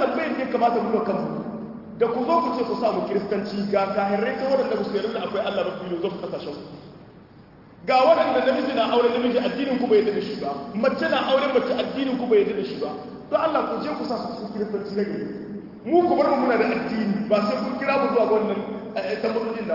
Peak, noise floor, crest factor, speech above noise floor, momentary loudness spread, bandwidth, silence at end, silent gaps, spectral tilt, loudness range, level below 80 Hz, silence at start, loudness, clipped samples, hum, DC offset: -6 dBFS; -48 dBFS; 16 dB; 25 dB; 11 LU; 5.8 kHz; 0 s; none; -7 dB/octave; 5 LU; -62 dBFS; 0 s; -23 LUFS; under 0.1%; none; under 0.1%